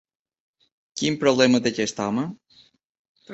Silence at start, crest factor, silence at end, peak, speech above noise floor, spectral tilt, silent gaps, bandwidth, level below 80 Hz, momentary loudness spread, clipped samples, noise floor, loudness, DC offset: 0.95 s; 20 dB; 0 s; -4 dBFS; 36 dB; -4.5 dB/octave; 2.85-3.15 s; 8.2 kHz; -64 dBFS; 12 LU; under 0.1%; -58 dBFS; -22 LUFS; under 0.1%